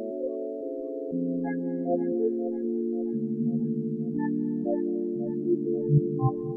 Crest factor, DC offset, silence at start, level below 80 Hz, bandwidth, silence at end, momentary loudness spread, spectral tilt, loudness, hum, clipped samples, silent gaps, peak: 16 dB; under 0.1%; 0 s; -72 dBFS; 2.2 kHz; 0 s; 8 LU; -14 dB/octave; -29 LUFS; none; under 0.1%; none; -12 dBFS